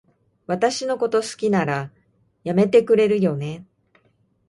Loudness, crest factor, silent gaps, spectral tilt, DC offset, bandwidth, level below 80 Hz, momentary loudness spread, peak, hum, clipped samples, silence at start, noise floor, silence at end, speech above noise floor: -20 LUFS; 18 dB; none; -6 dB/octave; under 0.1%; 11.5 kHz; -62 dBFS; 15 LU; -4 dBFS; none; under 0.1%; 0.5 s; -63 dBFS; 0.85 s; 44 dB